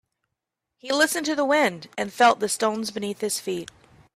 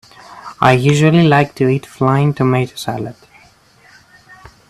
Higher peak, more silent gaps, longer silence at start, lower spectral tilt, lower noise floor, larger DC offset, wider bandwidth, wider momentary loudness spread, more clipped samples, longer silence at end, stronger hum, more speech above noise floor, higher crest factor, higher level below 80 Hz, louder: second, -6 dBFS vs 0 dBFS; neither; first, 0.85 s vs 0.3 s; second, -2.5 dB/octave vs -6.5 dB/octave; first, -83 dBFS vs -48 dBFS; neither; first, 15.5 kHz vs 13.5 kHz; second, 12 LU vs 15 LU; neither; second, 0.5 s vs 1.6 s; neither; first, 60 dB vs 35 dB; about the same, 20 dB vs 16 dB; second, -68 dBFS vs -50 dBFS; second, -23 LUFS vs -14 LUFS